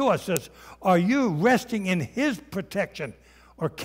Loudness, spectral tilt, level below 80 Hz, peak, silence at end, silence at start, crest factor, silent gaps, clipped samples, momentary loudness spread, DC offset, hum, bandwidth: -25 LUFS; -5.5 dB/octave; -58 dBFS; -2 dBFS; 0 s; 0 s; 22 dB; none; under 0.1%; 12 LU; under 0.1%; none; 16 kHz